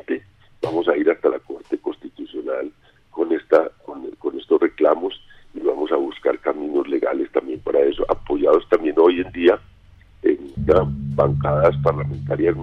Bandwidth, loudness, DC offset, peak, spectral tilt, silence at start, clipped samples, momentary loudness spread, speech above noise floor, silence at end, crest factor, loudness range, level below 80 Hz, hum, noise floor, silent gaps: 6 kHz; -20 LUFS; under 0.1%; -4 dBFS; -9 dB/octave; 0.1 s; under 0.1%; 12 LU; 29 dB; 0 s; 16 dB; 5 LU; -42 dBFS; none; -49 dBFS; none